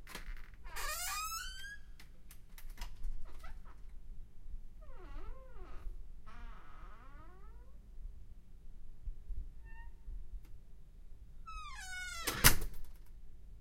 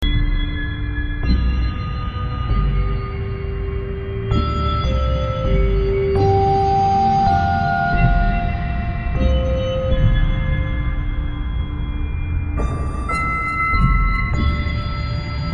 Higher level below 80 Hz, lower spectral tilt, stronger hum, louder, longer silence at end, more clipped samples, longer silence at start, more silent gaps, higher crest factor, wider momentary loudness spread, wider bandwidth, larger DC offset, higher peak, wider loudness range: second, -46 dBFS vs -22 dBFS; second, -2 dB/octave vs -7.5 dB/octave; neither; second, -37 LUFS vs -20 LUFS; about the same, 0 s vs 0 s; neither; about the same, 0 s vs 0 s; neither; first, 34 dB vs 16 dB; first, 21 LU vs 9 LU; first, 16 kHz vs 7.2 kHz; neither; second, -6 dBFS vs -2 dBFS; first, 19 LU vs 6 LU